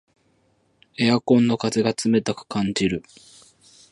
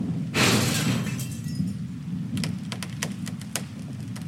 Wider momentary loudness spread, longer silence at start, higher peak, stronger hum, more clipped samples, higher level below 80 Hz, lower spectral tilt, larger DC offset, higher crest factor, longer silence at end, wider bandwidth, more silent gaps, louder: second, 9 LU vs 13 LU; first, 1 s vs 0 s; about the same, -4 dBFS vs -4 dBFS; neither; neither; about the same, -56 dBFS vs -54 dBFS; first, -5.5 dB/octave vs -4 dB/octave; neither; about the same, 20 dB vs 24 dB; first, 0.95 s vs 0 s; second, 11.5 kHz vs 16.5 kHz; neither; first, -21 LUFS vs -27 LUFS